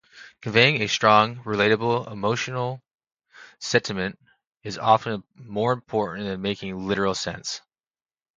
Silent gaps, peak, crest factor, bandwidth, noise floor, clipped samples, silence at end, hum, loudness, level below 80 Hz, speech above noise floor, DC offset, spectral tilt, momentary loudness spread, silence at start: 2.95-2.99 s, 3.12-3.17 s, 4.47-4.51 s; 0 dBFS; 24 dB; 9.4 kHz; under -90 dBFS; under 0.1%; 0.8 s; none; -23 LUFS; -58 dBFS; over 67 dB; under 0.1%; -4.5 dB/octave; 16 LU; 0.15 s